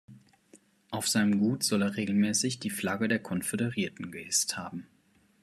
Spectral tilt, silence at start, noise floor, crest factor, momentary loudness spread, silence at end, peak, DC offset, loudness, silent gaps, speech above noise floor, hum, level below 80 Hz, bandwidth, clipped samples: -3.5 dB/octave; 0.1 s; -61 dBFS; 18 dB; 11 LU; 0.6 s; -12 dBFS; under 0.1%; -29 LUFS; none; 32 dB; none; -72 dBFS; 14 kHz; under 0.1%